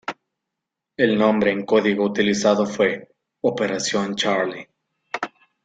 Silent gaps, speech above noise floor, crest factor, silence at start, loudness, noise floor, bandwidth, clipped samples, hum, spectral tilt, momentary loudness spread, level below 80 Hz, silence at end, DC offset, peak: none; 63 dB; 18 dB; 0.1 s; -21 LUFS; -83 dBFS; 9.2 kHz; under 0.1%; none; -4.5 dB/octave; 15 LU; -62 dBFS; 0.4 s; under 0.1%; -4 dBFS